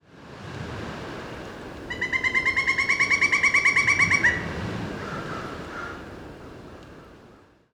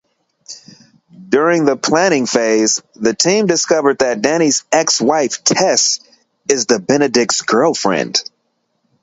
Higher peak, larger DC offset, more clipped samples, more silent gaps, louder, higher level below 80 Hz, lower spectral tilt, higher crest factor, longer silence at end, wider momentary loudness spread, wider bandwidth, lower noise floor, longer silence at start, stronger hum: second, -8 dBFS vs 0 dBFS; neither; neither; neither; second, -21 LUFS vs -14 LUFS; first, -50 dBFS vs -60 dBFS; about the same, -3 dB/octave vs -2.5 dB/octave; about the same, 18 dB vs 16 dB; second, 0.4 s vs 0.8 s; first, 23 LU vs 7 LU; first, 14.5 kHz vs 8 kHz; second, -53 dBFS vs -67 dBFS; second, 0.15 s vs 0.5 s; neither